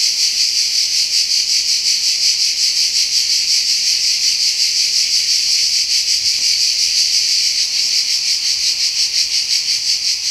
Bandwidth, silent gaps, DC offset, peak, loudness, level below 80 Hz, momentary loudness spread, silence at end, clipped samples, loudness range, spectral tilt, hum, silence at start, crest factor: 16 kHz; none; under 0.1%; 0 dBFS; -12 LUFS; -54 dBFS; 2 LU; 0 s; under 0.1%; 1 LU; 4.5 dB/octave; none; 0 s; 16 dB